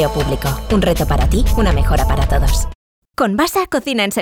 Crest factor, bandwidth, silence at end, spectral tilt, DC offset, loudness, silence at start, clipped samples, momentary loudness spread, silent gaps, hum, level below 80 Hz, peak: 12 dB; 19.5 kHz; 0 s; -5.5 dB/octave; under 0.1%; -17 LUFS; 0 s; under 0.1%; 5 LU; 2.75-3.02 s; none; -18 dBFS; -4 dBFS